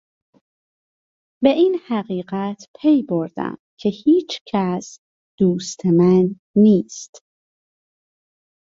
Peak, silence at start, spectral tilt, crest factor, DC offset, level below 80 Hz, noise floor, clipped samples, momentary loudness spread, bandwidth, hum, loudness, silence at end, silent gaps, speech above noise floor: -2 dBFS; 1.4 s; -7 dB/octave; 18 dB; under 0.1%; -62 dBFS; under -90 dBFS; under 0.1%; 14 LU; 7.8 kHz; none; -19 LUFS; 1.6 s; 2.68-2.74 s, 3.59-3.77 s, 4.41-4.45 s, 4.98-5.38 s, 6.39-6.54 s; over 72 dB